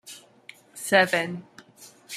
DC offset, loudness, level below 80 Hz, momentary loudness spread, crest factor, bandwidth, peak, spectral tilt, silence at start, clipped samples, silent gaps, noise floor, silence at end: under 0.1%; -23 LUFS; -76 dBFS; 24 LU; 24 dB; 15.5 kHz; -4 dBFS; -3 dB/octave; 0.05 s; under 0.1%; none; -51 dBFS; 0 s